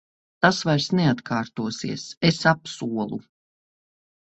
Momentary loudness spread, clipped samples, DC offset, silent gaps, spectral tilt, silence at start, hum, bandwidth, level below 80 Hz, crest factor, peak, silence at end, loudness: 11 LU; under 0.1%; under 0.1%; 2.17-2.21 s; -5 dB/octave; 0.4 s; none; 8.2 kHz; -60 dBFS; 24 dB; -2 dBFS; 1 s; -23 LUFS